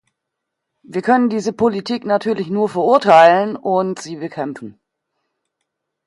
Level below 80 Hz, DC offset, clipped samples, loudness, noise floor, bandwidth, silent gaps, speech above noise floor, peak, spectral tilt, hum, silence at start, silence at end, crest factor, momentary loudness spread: -62 dBFS; under 0.1%; under 0.1%; -16 LUFS; -79 dBFS; 11.5 kHz; none; 63 dB; 0 dBFS; -6 dB/octave; none; 0.9 s; 1.35 s; 18 dB; 17 LU